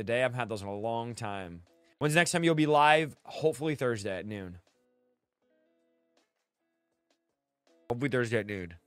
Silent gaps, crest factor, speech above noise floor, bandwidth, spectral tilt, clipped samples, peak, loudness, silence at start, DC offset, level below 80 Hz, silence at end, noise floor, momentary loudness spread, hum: none; 24 dB; 54 dB; 15.5 kHz; -5 dB/octave; under 0.1%; -8 dBFS; -29 LUFS; 0 s; under 0.1%; -68 dBFS; 0.1 s; -84 dBFS; 15 LU; none